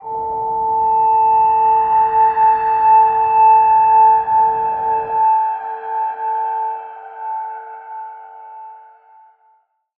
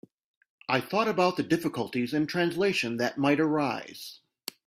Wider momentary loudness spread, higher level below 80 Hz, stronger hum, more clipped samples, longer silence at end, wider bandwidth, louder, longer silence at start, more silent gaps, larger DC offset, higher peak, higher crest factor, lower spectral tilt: first, 20 LU vs 16 LU; first, -54 dBFS vs -68 dBFS; neither; neither; first, 1.2 s vs 0.55 s; second, 3.1 kHz vs 16 kHz; first, -14 LUFS vs -27 LUFS; second, 0 s vs 0.7 s; neither; neither; first, -4 dBFS vs -10 dBFS; second, 12 dB vs 20 dB; first, -7.5 dB/octave vs -5.5 dB/octave